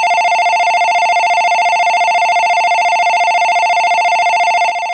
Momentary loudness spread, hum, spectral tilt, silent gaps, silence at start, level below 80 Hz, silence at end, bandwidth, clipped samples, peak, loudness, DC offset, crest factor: 0 LU; none; 1 dB/octave; none; 0 s; -70 dBFS; 0 s; 8.8 kHz; under 0.1%; -2 dBFS; -11 LUFS; under 0.1%; 8 dB